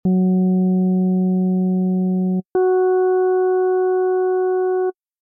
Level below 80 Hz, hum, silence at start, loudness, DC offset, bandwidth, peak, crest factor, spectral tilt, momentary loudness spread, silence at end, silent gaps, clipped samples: -62 dBFS; none; 0.05 s; -18 LUFS; under 0.1%; 1.6 kHz; -12 dBFS; 6 dB; -14 dB/octave; 3 LU; 0.3 s; none; under 0.1%